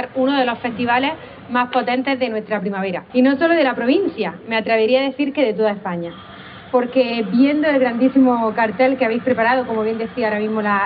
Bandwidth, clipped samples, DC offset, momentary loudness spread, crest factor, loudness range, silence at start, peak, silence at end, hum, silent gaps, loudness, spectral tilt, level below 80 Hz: 5 kHz; under 0.1%; under 0.1%; 8 LU; 14 dB; 3 LU; 0 s; -4 dBFS; 0 s; none; none; -18 LUFS; -3.5 dB/octave; -58 dBFS